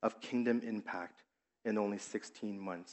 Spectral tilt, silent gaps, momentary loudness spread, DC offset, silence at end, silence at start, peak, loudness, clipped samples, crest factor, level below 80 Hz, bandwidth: -5.5 dB/octave; none; 10 LU; under 0.1%; 0 s; 0 s; -20 dBFS; -39 LUFS; under 0.1%; 20 dB; under -90 dBFS; 8.2 kHz